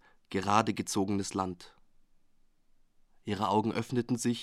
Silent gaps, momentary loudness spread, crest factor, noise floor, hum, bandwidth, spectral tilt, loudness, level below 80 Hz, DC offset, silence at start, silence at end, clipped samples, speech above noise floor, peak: none; 10 LU; 22 dB; -64 dBFS; none; 15 kHz; -5 dB/octave; -31 LUFS; -66 dBFS; under 0.1%; 0.3 s; 0 s; under 0.1%; 34 dB; -10 dBFS